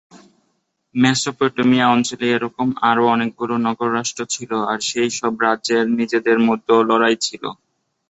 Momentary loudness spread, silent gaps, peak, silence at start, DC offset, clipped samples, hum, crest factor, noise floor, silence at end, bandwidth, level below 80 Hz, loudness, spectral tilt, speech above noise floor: 7 LU; none; -2 dBFS; 0.15 s; under 0.1%; under 0.1%; none; 16 dB; -69 dBFS; 0.55 s; 8.2 kHz; -62 dBFS; -18 LUFS; -4 dB/octave; 51 dB